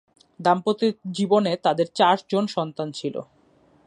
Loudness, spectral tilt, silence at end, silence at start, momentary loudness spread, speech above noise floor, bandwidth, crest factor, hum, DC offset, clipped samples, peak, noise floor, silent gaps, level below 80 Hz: -23 LUFS; -5.5 dB/octave; 0.65 s; 0.4 s; 10 LU; 36 dB; 11 kHz; 18 dB; none; under 0.1%; under 0.1%; -4 dBFS; -58 dBFS; none; -72 dBFS